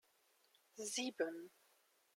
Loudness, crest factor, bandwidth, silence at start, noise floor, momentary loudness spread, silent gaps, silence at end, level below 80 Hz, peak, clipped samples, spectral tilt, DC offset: -43 LUFS; 22 dB; 16.5 kHz; 0.75 s; -77 dBFS; 19 LU; none; 0.7 s; under -90 dBFS; -26 dBFS; under 0.1%; -1 dB/octave; under 0.1%